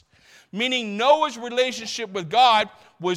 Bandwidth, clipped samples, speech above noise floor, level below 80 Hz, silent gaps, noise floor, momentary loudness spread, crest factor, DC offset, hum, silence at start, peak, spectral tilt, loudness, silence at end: 14 kHz; under 0.1%; 33 dB; -72 dBFS; none; -54 dBFS; 13 LU; 18 dB; under 0.1%; none; 0.55 s; -6 dBFS; -3 dB/octave; -21 LUFS; 0 s